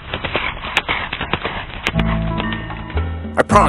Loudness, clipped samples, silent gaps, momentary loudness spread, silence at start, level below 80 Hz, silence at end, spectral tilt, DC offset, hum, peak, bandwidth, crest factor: -21 LUFS; under 0.1%; none; 6 LU; 0 s; -28 dBFS; 0 s; -5.5 dB/octave; under 0.1%; none; 0 dBFS; 14 kHz; 20 dB